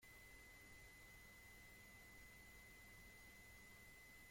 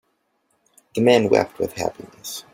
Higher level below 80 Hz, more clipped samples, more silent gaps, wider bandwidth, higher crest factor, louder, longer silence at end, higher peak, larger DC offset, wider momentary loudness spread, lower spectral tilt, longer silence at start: second, -72 dBFS vs -58 dBFS; neither; neither; about the same, 16.5 kHz vs 16.5 kHz; second, 14 dB vs 20 dB; second, -62 LUFS vs -20 LUFS; about the same, 0 s vs 0.1 s; second, -50 dBFS vs -2 dBFS; neither; second, 0 LU vs 16 LU; second, -2.5 dB/octave vs -5 dB/octave; second, 0 s vs 0.95 s